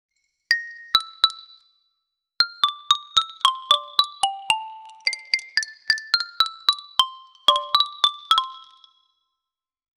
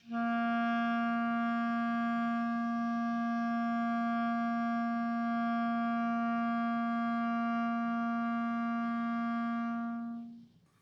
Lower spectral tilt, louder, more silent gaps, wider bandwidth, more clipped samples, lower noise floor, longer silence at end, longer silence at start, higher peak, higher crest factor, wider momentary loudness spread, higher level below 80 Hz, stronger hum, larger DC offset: second, 2.5 dB/octave vs -7 dB/octave; first, -21 LUFS vs -33 LUFS; neither; first, over 20 kHz vs 6.2 kHz; neither; first, -86 dBFS vs -56 dBFS; first, 1.4 s vs 0.35 s; first, 0.5 s vs 0.05 s; first, 0 dBFS vs -24 dBFS; first, 24 dB vs 8 dB; first, 8 LU vs 2 LU; first, -68 dBFS vs -84 dBFS; neither; neither